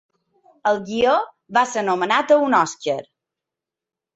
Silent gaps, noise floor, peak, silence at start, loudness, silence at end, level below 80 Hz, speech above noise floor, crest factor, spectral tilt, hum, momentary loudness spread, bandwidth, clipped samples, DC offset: none; -87 dBFS; -4 dBFS; 0.65 s; -20 LUFS; 1.15 s; -62 dBFS; 69 dB; 18 dB; -3.5 dB/octave; none; 9 LU; 8.2 kHz; under 0.1%; under 0.1%